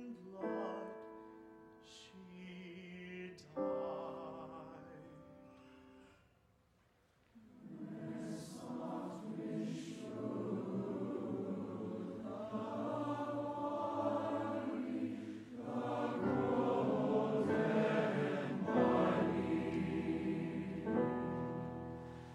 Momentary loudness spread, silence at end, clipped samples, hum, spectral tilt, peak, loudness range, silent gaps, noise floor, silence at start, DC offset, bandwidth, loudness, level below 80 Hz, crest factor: 19 LU; 0 s; under 0.1%; none; -7.5 dB/octave; -20 dBFS; 16 LU; none; -73 dBFS; 0 s; under 0.1%; 12 kHz; -40 LUFS; -70 dBFS; 20 dB